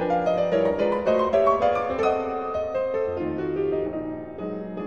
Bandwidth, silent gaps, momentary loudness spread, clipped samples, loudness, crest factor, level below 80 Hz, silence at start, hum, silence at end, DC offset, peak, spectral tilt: 8.2 kHz; none; 12 LU; under 0.1%; -24 LUFS; 16 dB; -52 dBFS; 0 s; none; 0 s; 0.2%; -8 dBFS; -7 dB/octave